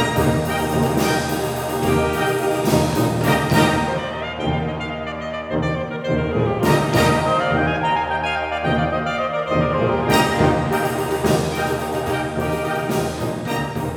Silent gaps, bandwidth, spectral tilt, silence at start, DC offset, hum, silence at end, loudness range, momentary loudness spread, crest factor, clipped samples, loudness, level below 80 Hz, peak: none; over 20 kHz; -5.5 dB/octave; 0 s; under 0.1%; none; 0 s; 2 LU; 7 LU; 16 dB; under 0.1%; -20 LUFS; -38 dBFS; -2 dBFS